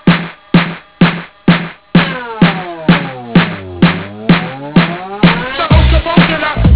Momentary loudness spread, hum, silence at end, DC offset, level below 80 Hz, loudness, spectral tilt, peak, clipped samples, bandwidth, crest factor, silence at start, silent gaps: 6 LU; none; 0 s; 0.5%; -20 dBFS; -12 LUFS; -10.5 dB/octave; 0 dBFS; 0.7%; 4 kHz; 12 dB; 0.05 s; none